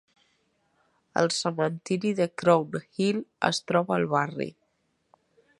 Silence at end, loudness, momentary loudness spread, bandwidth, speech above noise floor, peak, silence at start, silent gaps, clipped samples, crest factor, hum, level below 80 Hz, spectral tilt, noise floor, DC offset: 1.1 s; -27 LUFS; 9 LU; 11.5 kHz; 47 dB; -6 dBFS; 1.15 s; none; under 0.1%; 22 dB; none; -72 dBFS; -5 dB/octave; -73 dBFS; under 0.1%